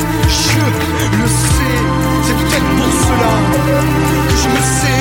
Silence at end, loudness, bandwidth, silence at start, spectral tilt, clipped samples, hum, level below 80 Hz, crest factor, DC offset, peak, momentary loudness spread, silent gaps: 0 s; -13 LUFS; 17 kHz; 0 s; -4.5 dB/octave; under 0.1%; none; -22 dBFS; 12 dB; under 0.1%; 0 dBFS; 2 LU; none